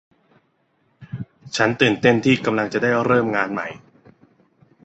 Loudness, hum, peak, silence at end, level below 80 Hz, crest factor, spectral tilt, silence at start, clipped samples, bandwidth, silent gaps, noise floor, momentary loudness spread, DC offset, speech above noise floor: -19 LUFS; none; -2 dBFS; 1.05 s; -58 dBFS; 20 dB; -5.5 dB/octave; 1 s; under 0.1%; 8.2 kHz; none; -65 dBFS; 18 LU; under 0.1%; 46 dB